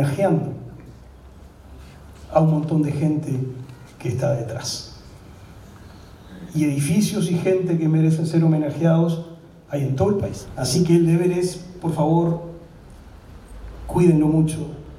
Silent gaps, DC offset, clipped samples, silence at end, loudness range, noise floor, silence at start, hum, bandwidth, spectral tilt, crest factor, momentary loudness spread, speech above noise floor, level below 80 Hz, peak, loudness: none; under 0.1%; under 0.1%; 0 s; 6 LU; -44 dBFS; 0 s; none; 14 kHz; -7 dB/octave; 18 dB; 18 LU; 24 dB; -46 dBFS; -2 dBFS; -21 LUFS